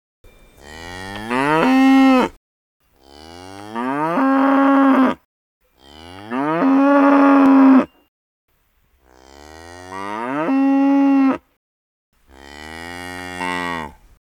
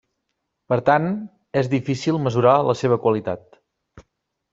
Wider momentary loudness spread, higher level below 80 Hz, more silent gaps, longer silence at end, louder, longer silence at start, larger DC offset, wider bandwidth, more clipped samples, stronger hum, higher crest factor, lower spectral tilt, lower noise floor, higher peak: first, 22 LU vs 10 LU; first, -54 dBFS vs -60 dBFS; first, 2.37-2.80 s, 5.25-5.61 s, 8.08-8.48 s, 11.57-12.12 s vs none; second, 0.4 s vs 0.55 s; first, -15 LUFS vs -20 LUFS; about the same, 0.65 s vs 0.7 s; neither; first, 11 kHz vs 7.8 kHz; neither; neither; about the same, 16 dB vs 18 dB; about the same, -6 dB/octave vs -7 dB/octave; second, -61 dBFS vs -77 dBFS; about the same, 0 dBFS vs -2 dBFS